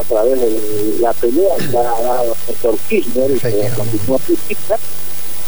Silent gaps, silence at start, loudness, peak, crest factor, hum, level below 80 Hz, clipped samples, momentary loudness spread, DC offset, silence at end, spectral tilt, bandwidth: none; 0 s; -15 LUFS; -2 dBFS; 14 dB; none; -40 dBFS; under 0.1%; 3 LU; 20%; 0 s; -5.5 dB/octave; over 20 kHz